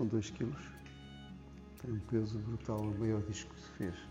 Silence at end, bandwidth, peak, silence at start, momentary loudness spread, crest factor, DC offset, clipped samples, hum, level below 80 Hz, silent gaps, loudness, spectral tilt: 0 s; 16 kHz; -22 dBFS; 0 s; 16 LU; 18 dB; under 0.1%; under 0.1%; none; -56 dBFS; none; -40 LUFS; -7 dB/octave